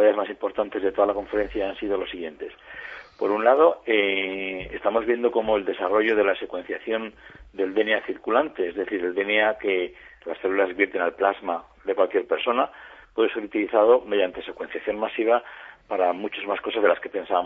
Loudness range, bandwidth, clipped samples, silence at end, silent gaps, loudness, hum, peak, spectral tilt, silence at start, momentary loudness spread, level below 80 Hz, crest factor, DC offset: 3 LU; 4.9 kHz; under 0.1%; 0 s; none; -24 LUFS; none; -4 dBFS; -6.5 dB/octave; 0 s; 13 LU; -56 dBFS; 20 dB; under 0.1%